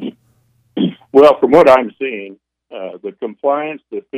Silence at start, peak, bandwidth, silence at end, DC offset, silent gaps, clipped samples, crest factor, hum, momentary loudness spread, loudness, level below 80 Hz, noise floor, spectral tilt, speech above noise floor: 0 s; 0 dBFS; 11.5 kHz; 0 s; under 0.1%; none; 0.2%; 14 dB; none; 21 LU; -13 LUFS; -54 dBFS; -57 dBFS; -7 dB/octave; 44 dB